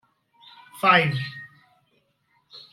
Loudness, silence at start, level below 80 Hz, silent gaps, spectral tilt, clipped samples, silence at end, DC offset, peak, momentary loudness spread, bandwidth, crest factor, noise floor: -21 LUFS; 0.75 s; -70 dBFS; none; -5.5 dB/octave; under 0.1%; 0.15 s; under 0.1%; -4 dBFS; 24 LU; 16 kHz; 22 dB; -68 dBFS